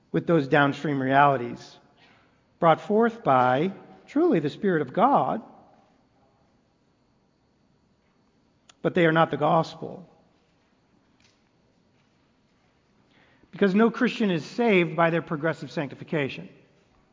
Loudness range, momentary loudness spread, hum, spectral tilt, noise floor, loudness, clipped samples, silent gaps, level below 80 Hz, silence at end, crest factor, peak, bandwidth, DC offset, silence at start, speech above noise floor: 7 LU; 12 LU; none; -7.5 dB/octave; -66 dBFS; -24 LUFS; under 0.1%; none; -68 dBFS; 0.65 s; 22 dB; -4 dBFS; 7.6 kHz; under 0.1%; 0.15 s; 43 dB